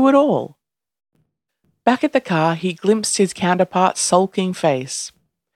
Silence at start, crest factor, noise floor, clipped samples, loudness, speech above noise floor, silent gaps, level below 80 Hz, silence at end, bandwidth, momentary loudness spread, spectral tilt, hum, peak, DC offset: 0 s; 18 dB; -68 dBFS; under 0.1%; -18 LUFS; 51 dB; none; -64 dBFS; 0.45 s; 14 kHz; 8 LU; -4.5 dB/octave; none; 0 dBFS; under 0.1%